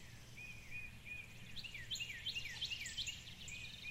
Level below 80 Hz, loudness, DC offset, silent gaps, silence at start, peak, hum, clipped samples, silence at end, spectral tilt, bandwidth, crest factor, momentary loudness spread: -62 dBFS; -46 LUFS; under 0.1%; none; 0 s; -32 dBFS; none; under 0.1%; 0 s; -1 dB/octave; 16 kHz; 16 dB; 9 LU